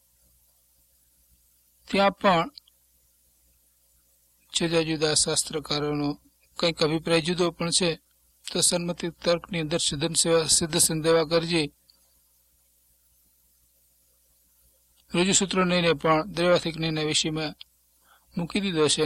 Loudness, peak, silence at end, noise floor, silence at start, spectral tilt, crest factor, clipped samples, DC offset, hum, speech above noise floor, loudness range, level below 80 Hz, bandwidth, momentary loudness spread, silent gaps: -24 LUFS; -8 dBFS; 0 s; -65 dBFS; 1.9 s; -3 dB/octave; 20 dB; under 0.1%; under 0.1%; 60 Hz at -55 dBFS; 40 dB; 6 LU; -56 dBFS; 15.5 kHz; 11 LU; none